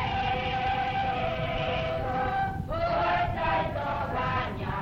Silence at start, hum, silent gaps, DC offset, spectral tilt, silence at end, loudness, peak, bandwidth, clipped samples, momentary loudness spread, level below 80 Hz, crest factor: 0 s; none; none; under 0.1%; -7 dB/octave; 0 s; -29 LUFS; -16 dBFS; 16 kHz; under 0.1%; 4 LU; -42 dBFS; 12 dB